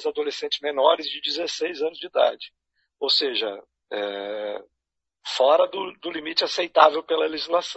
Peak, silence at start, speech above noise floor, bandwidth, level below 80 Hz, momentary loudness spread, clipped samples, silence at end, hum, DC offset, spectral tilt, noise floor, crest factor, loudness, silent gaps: -2 dBFS; 0 s; 60 dB; 8.2 kHz; -74 dBFS; 14 LU; under 0.1%; 0 s; none; under 0.1%; -1.5 dB/octave; -83 dBFS; 22 dB; -23 LUFS; none